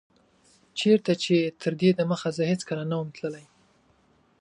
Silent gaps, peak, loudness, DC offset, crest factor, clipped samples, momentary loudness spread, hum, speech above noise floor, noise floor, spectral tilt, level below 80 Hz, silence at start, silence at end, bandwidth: none; -8 dBFS; -26 LUFS; under 0.1%; 18 dB; under 0.1%; 13 LU; none; 39 dB; -63 dBFS; -6 dB/octave; -70 dBFS; 0.75 s; 1 s; 10.5 kHz